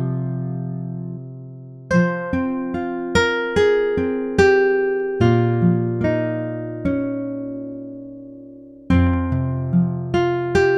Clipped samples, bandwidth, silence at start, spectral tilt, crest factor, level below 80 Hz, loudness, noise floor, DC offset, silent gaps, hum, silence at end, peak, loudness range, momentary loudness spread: under 0.1%; 10 kHz; 0 s; -7.5 dB/octave; 18 dB; -40 dBFS; -20 LUFS; -40 dBFS; under 0.1%; none; none; 0 s; -2 dBFS; 6 LU; 17 LU